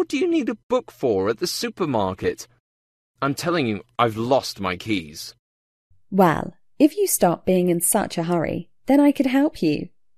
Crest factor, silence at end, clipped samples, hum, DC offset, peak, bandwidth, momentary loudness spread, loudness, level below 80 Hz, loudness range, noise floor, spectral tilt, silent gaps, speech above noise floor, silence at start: 18 dB; 0.3 s; under 0.1%; none; under 0.1%; -4 dBFS; 14 kHz; 9 LU; -22 LUFS; -54 dBFS; 5 LU; under -90 dBFS; -5 dB/octave; 0.63-0.70 s, 2.60-3.14 s, 5.39-5.90 s; over 69 dB; 0 s